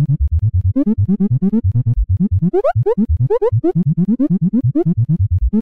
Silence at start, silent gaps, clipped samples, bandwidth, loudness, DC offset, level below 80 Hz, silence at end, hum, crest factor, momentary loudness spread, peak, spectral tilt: 0 s; none; under 0.1%; 3.1 kHz; -16 LUFS; 2%; -24 dBFS; 0 s; none; 6 dB; 1 LU; -8 dBFS; -13 dB/octave